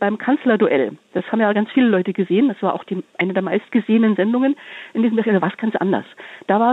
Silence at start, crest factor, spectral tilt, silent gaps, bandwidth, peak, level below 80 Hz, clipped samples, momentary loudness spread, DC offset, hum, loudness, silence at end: 0 s; 14 dB; -8.5 dB/octave; none; 4.1 kHz; -4 dBFS; -72 dBFS; under 0.1%; 9 LU; under 0.1%; none; -19 LUFS; 0 s